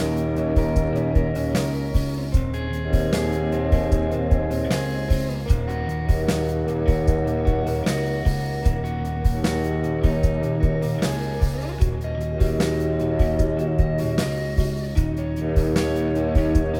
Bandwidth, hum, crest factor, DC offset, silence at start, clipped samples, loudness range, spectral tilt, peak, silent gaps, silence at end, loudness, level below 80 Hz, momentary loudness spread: 17 kHz; none; 16 dB; under 0.1%; 0 s; under 0.1%; 0 LU; -7 dB/octave; -4 dBFS; none; 0 s; -23 LUFS; -26 dBFS; 3 LU